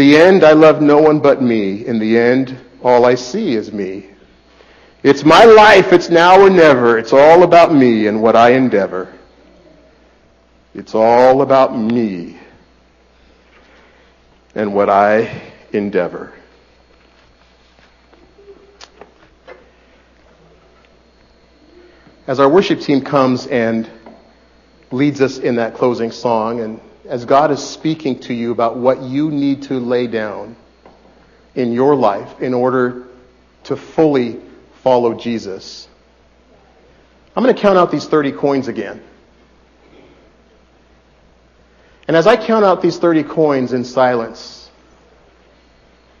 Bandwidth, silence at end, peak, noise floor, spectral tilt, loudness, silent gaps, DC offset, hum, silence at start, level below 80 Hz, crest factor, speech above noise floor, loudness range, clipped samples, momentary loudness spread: 9.2 kHz; 1.65 s; 0 dBFS; -50 dBFS; -6 dB/octave; -12 LUFS; none; under 0.1%; none; 0 s; -50 dBFS; 14 dB; 39 dB; 11 LU; under 0.1%; 19 LU